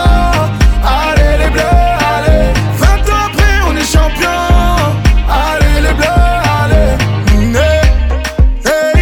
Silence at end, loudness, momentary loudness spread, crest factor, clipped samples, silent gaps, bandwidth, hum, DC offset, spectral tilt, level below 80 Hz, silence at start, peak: 0 s; -11 LUFS; 2 LU; 8 dB; under 0.1%; none; 17 kHz; none; under 0.1%; -5.5 dB/octave; -12 dBFS; 0 s; 0 dBFS